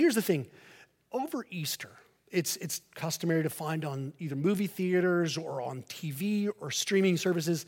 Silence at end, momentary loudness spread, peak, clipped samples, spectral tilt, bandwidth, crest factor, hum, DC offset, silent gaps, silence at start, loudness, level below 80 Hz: 0.05 s; 11 LU; -14 dBFS; under 0.1%; -5 dB/octave; 17 kHz; 18 dB; none; under 0.1%; none; 0 s; -31 LUFS; -78 dBFS